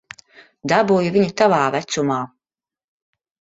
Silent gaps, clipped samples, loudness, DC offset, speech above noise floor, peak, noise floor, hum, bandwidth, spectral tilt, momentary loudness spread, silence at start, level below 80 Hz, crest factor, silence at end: none; under 0.1%; -18 LUFS; under 0.1%; over 73 dB; -2 dBFS; under -90 dBFS; none; 8 kHz; -5.5 dB/octave; 10 LU; 0.65 s; -60 dBFS; 18 dB; 1.25 s